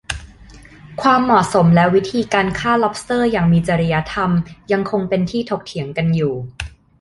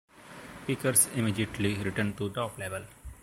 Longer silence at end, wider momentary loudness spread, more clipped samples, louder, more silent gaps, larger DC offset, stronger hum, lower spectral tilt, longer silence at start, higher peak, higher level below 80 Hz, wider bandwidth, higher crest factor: first, 0.3 s vs 0.05 s; second, 13 LU vs 23 LU; neither; first, -17 LUFS vs -29 LUFS; neither; neither; neither; first, -6.5 dB/octave vs -4 dB/octave; about the same, 0.1 s vs 0.15 s; first, -2 dBFS vs -10 dBFS; first, -40 dBFS vs -54 dBFS; second, 11.5 kHz vs 16 kHz; second, 16 dB vs 22 dB